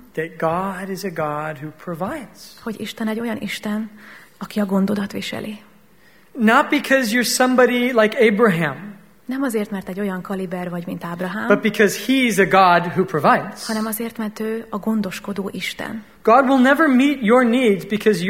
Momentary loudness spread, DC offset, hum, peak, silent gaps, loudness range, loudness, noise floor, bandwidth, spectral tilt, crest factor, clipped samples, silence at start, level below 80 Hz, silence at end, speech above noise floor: 15 LU; 0.2%; none; 0 dBFS; none; 9 LU; -19 LUFS; -53 dBFS; 16.5 kHz; -5 dB/octave; 20 dB; under 0.1%; 0.15 s; -58 dBFS; 0 s; 34 dB